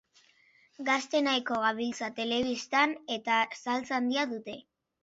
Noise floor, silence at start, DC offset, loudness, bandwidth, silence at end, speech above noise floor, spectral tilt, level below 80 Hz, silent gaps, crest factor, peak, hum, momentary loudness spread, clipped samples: -64 dBFS; 0.8 s; under 0.1%; -30 LUFS; 8 kHz; 0.4 s; 34 dB; -2.5 dB/octave; -70 dBFS; none; 20 dB; -12 dBFS; none; 8 LU; under 0.1%